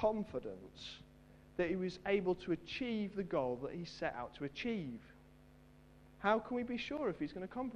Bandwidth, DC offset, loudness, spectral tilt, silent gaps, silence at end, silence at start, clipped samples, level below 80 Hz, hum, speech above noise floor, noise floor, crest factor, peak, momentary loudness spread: 11 kHz; under 0.1%; -40 LUFS; -6.5 dB/octave; none; 0 s; 0 s; under 0.1%; -64 dBFS; none; 23 dB; -62 dBFS; 22 dB; -18 dBFS; 14 LU